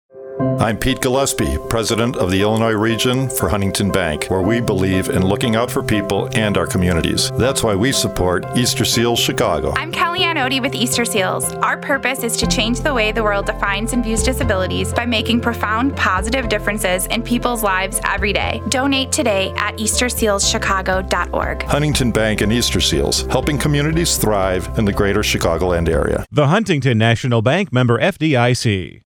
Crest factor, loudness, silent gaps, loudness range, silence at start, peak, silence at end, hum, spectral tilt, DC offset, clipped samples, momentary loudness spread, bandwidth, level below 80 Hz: 16 dB; -17 LUFS; none; 1 LU; 0.15 s; 0 dBFS; 0.15 s; none; -4 dB/octave; under 0.1%; under 0.1%; 4 LU; over 20 kHz; -30 dBFS